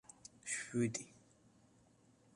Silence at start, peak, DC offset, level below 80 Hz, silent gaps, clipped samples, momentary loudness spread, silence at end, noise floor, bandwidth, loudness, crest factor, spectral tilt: 0.45 s; -24 dBFS; under 0.1%; -78 dBFS; none; under 0.1%; 19 LU; 1.15 s; -70 dBFS; 11.5 kHz; -41 LUFS; 22 dB; -4.5 dB/octave